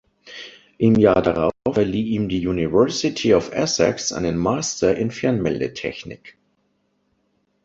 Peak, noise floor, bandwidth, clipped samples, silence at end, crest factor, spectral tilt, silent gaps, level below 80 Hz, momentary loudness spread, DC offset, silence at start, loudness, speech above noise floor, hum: -2 dBFS; -68 dBFS; 8 kHz; under 0.1%; 1.35 s; 18 dB; -5 dB/octave; none; -46 dBFS; 20 LU; under 0.1%; 0.25 s; -20 LUFS; 48 dB; none